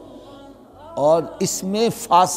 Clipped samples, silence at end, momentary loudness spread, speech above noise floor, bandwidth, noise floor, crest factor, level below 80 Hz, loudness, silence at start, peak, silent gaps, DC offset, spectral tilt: under 0.1%; 0 s; 20 LU; 24 dB; 16 kHz; -43 dBFS; 18 dB; -56 dBFS; -19 LUFS; 0 s; -2 dBFS; none; under 0.1%; -4 dB/octave